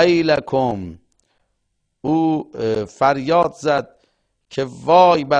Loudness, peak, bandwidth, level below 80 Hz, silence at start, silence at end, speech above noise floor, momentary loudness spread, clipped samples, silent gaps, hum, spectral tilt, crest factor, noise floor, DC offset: -18 LUFS; 0 dBFS; 9.4 kHz; -54 dBFS; 0 s; 0 s; 54 dB; 14 LU; under 0.1%; none; none; -6 dB/octave; 18 dB; -71 dBFS; under 0.1%